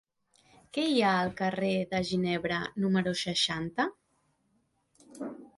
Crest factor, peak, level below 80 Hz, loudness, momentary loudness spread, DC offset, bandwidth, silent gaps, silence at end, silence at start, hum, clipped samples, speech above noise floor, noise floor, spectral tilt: 18 dB; -14 dBFS; -64 dBFS; -30 LUFS; 9 LU; under 0.1%; 11.5 kHz; none; 0.1 s; 0.75 s; none; under 0.1%; 44 dB; -73 dBFS; -5 dB/octave